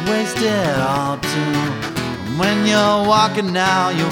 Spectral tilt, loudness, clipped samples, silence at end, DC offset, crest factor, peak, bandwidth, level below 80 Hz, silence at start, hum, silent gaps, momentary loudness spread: -4.5 dB/octave; -17 LUFS; under 0.1%; 0 s; under 0.1%; 16 dB; -2 dBFS; 19 kHz; -46 dBFS; 0 s; none; none; 8 LU